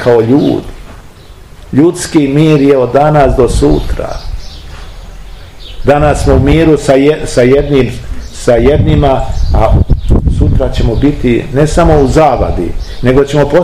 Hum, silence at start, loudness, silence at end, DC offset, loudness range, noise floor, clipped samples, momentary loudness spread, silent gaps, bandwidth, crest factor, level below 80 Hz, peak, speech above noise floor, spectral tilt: none; 0 s; -9 LUFS; 0 s; 0.6%; 3 LU; -32 dBFS; 4%; 12 LU; none; 13.5 kHz; 8 dB; -16 dBFS; 0 dBFS; 25 dB; -7 dB/octave